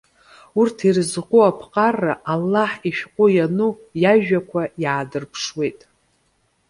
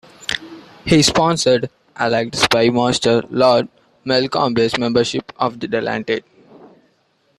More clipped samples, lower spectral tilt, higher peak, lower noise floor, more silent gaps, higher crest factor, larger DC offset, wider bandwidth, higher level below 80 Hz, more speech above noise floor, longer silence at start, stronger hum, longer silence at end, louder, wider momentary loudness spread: neither; first, -6 dB/octave vs -4 dB/octave; about the same, -2 dBFS vs 0 dBFS; first, -65 dBFS vs -61 dBFS; neither; about the same, 18 dB vs 18 dB; neither; second, 11.5 kHz vs 14 kHz; second, -60 dBFS vs -48 dBFS; about the same, 46 dB vs 45 dB; first, 0.55 s vs 0.2 s; neither; second, 0.95 s vs 1.2 s; about the same, -19 LUFS vs -17 LUFS; about the same, 10 LU vs 11 LU